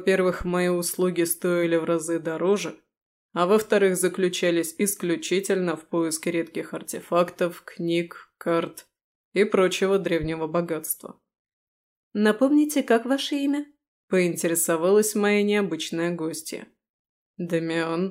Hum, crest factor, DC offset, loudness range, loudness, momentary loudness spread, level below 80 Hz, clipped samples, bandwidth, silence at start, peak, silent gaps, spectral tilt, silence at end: none; 16 dB; under 0.1%; 4 LU; -24 LUFS; 11 LU; -56 dBFS; under 0.1%; 16 kHz; 0 s; -8 dBFS; 2.97-3.29 s, 9.04-9.32 s, 11.39-11.45 s, 11.53-12.11 s, 13.88-14.08 s, 16.89-17.34 s; -4.5 dB/octave; 0 s